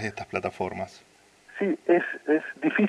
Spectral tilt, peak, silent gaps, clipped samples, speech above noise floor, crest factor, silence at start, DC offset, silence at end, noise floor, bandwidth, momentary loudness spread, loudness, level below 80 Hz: -6.5 dB/octave; -10 dBFS; none; under 0.1%; 22 dB; 18 dB; 0 s; under 0.1%; 0 s; -49 dBFS; 10.5 kHz; 13 LU; -27 LUFS; -68 dBFS